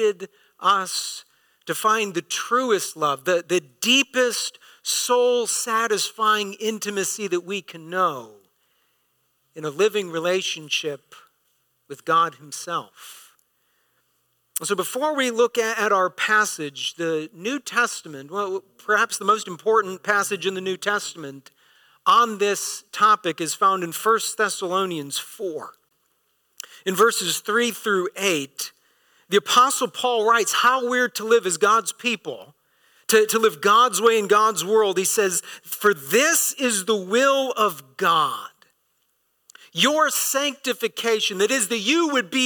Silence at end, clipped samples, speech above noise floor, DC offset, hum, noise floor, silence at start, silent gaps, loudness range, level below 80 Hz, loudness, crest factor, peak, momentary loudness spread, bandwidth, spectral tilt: 0 s; under 0.1%; 47 dB; under 0.1%; none; -69 dBFS; 0 s; none; 7 LU; -76 dBFS; -21 LUFS; 18 dB; -4 dBFS; 14 LU; 19 kHz; -2 dB/octave